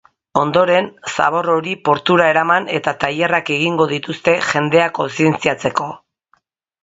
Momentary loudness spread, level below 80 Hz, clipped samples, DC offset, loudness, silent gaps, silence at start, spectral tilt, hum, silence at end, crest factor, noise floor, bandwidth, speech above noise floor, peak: 7 LU; -56 dBFS; under 0.1%; under 0.1%; -16 LUFS; none; 0.35 s; -5 dB/octave; none; 0.85 s; 16 dB; -61 dBFS; 8 kHz; 45 dB; 0 dBFS